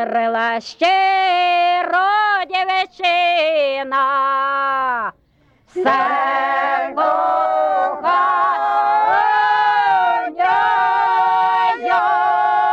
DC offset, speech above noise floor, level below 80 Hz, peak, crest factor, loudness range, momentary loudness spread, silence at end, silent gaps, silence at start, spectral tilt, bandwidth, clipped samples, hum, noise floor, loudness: under 0.1%; 39 dB; -64 dBFS; -4 dBFS; 12 dB; 3 LU; 4 LU; 0 s; none; 0 s; -3 dB/octave; 8 kHz; under 0.1%; none; -56 dBFS; -16 LUFS